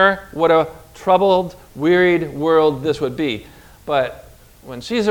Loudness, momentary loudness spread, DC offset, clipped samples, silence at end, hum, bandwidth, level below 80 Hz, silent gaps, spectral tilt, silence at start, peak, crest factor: -18 LUFS; 14 LU; under 0.1%; under 0.1%; 0 s; none; 17.5 kHz; -48 dBFS; none; -6 dB/octave; 0 s; 0 dBFS; 18 dB